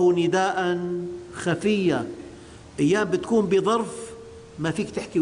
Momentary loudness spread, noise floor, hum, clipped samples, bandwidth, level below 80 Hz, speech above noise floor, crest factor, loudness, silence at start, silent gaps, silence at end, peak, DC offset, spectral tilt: 18 LU; -44 dBFS; none; under 0.1%; 10.5 kHz; -56 dBFS; 20 dB; 12 dB; -24 LUFS; 0 s; none; 0 s; -12 dBFS; under 0.1%; -5.5 dB/octave